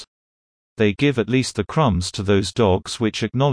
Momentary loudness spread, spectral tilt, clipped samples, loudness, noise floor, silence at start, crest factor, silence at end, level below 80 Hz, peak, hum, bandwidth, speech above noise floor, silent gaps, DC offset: 4 LU; -5.5 dB/octave; under 0.1%; -20 LUFS; under -90 dBFS; 0 s; 16 dB; 0 s; -42 dBFS; -4 dBFS; none; 10.5 kHz; over 71 dB; 0.07-0.76 s; under 0.1%